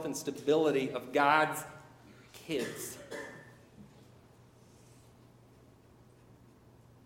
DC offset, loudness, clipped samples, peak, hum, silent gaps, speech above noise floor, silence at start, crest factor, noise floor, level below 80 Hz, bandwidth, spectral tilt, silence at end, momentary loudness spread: under 0.1%; -32 LUFS; under 0.1%; -12 dBFS; none; none; 28 dB; 0 s; 24 dB; -60 dBFS; -72 dBFS; 17 kHz; -4 dB/octave; 3.2 s; 24 LU